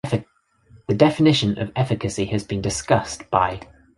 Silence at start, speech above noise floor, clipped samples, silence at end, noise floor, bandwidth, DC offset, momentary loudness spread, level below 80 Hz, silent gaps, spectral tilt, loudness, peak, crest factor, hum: 0.05 s; 38 dB; under 0.1%; 0.35 s; -58 dBFS; 11.5 kHz; under 0.1%; 10 LU; -46 dBFS; none; -5.5 dB/octave; -21 LUFS; -2 dBFS; 20 dB; none